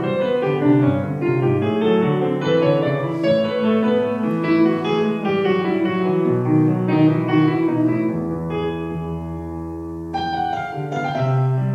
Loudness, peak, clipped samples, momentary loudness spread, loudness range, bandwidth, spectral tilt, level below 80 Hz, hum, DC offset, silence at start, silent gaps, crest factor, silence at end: -19 LUFS; -4 dBFS; under 0.1%; 9 LU; 5 LU; 7 kHz; -8.5 dB/octave; -48 dBFS; none; under 0.1%; 0 s; none; 14 dB; 0 s